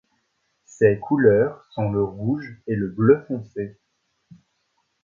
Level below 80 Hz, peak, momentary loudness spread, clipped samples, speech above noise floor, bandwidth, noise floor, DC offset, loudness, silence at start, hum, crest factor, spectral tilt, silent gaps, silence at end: -54 dBFS; -2 dBFS; 13 LU; under 0.1%; 51 dB; 7.4 kHz; -71 dBFS; under 0.1%; -22 LUFS; 0.8 s; none; 20 dB; -9 dB/octave; none; 1.35 s